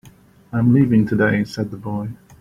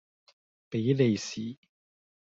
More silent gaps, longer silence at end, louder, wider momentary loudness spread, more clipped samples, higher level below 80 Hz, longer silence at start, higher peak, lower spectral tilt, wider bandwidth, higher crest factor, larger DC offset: neither; second, 0.25 s vs 0.8 s; first, -19 LUFS vs -29 LUFS; about the same, 12 LU vs 13 LU; neither; first, -48 dBFS vs -72 dBFS; second, 0.55 s vs 0.7 s; first, -4 dBFS vs -12 dBFS; first, -8.5 dB/octave vs -6.5 dB/octave; first, 11.5 kHz vs 7.8 kHz; about the same, 16 dB vs 20 dB; neither